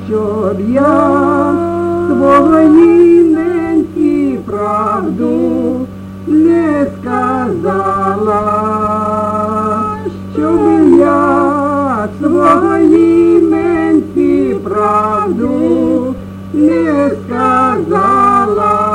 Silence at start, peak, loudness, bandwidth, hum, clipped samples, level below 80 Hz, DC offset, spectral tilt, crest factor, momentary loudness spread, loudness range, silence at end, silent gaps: 0 s; 0 dBFS; -11 LUFS; 10 kHz; none; under 0.1%; -42 dBFS; under 0.1%; -8 dB/octave; 10 dB; 8 LU; 5 LU; 0 s; none